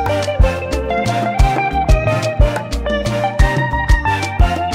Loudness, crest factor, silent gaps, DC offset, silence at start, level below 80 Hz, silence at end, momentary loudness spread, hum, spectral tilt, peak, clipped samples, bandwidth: -16 LUFS; 12 dB; none; under 0.1%; 0 s; -18 dBFS; 0 s; 4 LU; none; -6 dB/octave; -2 dBFS; under 0.1%; 15 kHz